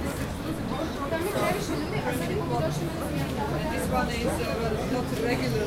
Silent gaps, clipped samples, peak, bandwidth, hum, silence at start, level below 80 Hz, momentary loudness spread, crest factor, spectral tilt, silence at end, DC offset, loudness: none; under 0.1%; -12 dBFS; 16 kHz; none; 0 s; -40 dBFS; 4 LU; 16 dB; -5.5 dB/octave; 0 s; under 0.1%; -29 LUFS